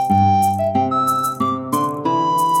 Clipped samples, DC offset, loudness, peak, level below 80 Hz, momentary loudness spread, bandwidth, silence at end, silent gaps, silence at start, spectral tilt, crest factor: under 0.1%; under 0.1%; -18 LUFS; -6 dBFS; -56 dBFS; 5 LU; 17 kHz; 0 s; none; 0 s; -6 dB/octave; 12 dB